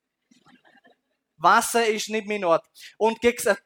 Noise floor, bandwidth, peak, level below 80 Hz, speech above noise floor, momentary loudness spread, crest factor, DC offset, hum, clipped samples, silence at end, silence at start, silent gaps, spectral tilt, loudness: -66 dBFS; 18.5 kHz; -4 dBFS; -62 dBFS; 44 dB; 7 LU; 20 dB; under 0.1%; none; under 0.1%; 0.1 s; 1.4 s; none; -2.5 dB/octave; -22 LUFS